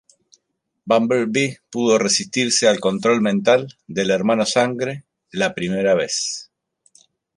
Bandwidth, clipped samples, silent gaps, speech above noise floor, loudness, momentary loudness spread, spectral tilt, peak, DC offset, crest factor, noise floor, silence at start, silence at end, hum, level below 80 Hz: 11.5 kHz; under 0.1%; none; 56 dB; -19 LUFS; 10 LU; -3.5 dB/octave; -2 dBFS; under 0.1%; 18 dB; -74 dBFS; 0.85 s; 0.95 s; none; -62 dBFS